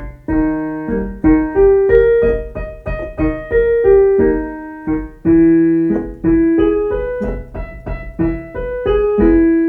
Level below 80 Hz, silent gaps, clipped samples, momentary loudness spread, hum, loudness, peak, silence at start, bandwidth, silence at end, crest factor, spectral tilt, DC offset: -28 dBFS; none; under 0.1%; 15 LU; none; -14 LUFS; 0 dBFS; 0 s; 3.5 kHz; 0 s; 14 dB; -10.5 dB/octave; under 0.1%